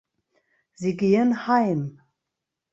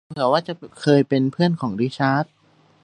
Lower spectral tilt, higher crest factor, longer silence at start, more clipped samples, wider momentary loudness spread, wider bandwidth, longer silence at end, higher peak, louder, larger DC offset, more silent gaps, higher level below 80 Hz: about the same, -7.5 dB/octave vs -7 dB/octave; about the same, 18 dB vs 18 dB; first, 0.8 s vs 0.1 s; neither; about the same, 10 LU vs 8 LU; second, 7.8 kHz vs 10 kHz; first, 0.8 s vs 0.6 s; second, -8 dBFS vs -2 dBFS; second, -23 LUFS vs -20 LUFS; neither; neither; about the same, -68 dBFS vs -64 dBFS